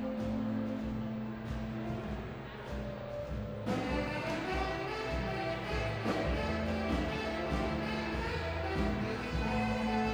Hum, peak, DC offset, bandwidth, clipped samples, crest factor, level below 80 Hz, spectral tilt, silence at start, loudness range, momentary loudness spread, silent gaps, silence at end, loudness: none; -20 dBFS; under 0.1%; over 20 kHz; under 0.1%; 16 dB; -44 dBFS; -6.5 dB/octave; 0 s; 4 LU; 7 LU; none; 0 s; -36 LUFS